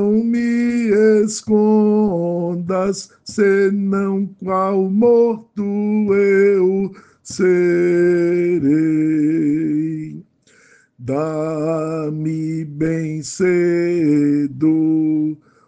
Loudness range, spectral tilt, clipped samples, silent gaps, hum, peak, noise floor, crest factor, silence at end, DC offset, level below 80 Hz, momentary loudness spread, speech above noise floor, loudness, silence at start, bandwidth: 6 LU; -7 dB/octave; under 0.1%; none; none; -4 dBFS; -53 dBFS; 12 dB; 0.35 s; under 0.1%; -58 dBFS; 9 LU; 36 dB; -17 LUFS; 0 s; 9.6 kHz